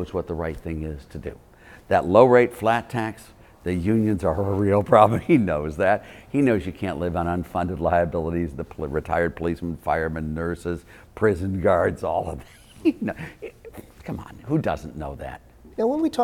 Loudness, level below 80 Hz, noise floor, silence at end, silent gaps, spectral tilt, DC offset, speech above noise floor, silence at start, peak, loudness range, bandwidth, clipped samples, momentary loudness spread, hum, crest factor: -23 LUFS; -42 dBFS; -43 dBFS; 0 s; none; -8 dB/octave; under 0.1%; 20 dB; 0 s; 0 dBFS; 8 LU; 17 kHz; under 0.1%; 18 LU; none; 22 dB